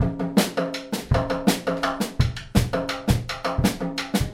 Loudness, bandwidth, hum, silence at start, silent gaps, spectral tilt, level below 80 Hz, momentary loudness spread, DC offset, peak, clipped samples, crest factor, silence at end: -24 LUFS; 16 kHz; none; 0 s; none; -5.5 dB/octave; -34 dBFS; 5 LU; under 0.1%; -4 dBFS; under 0.1%; 20 dB; 0 s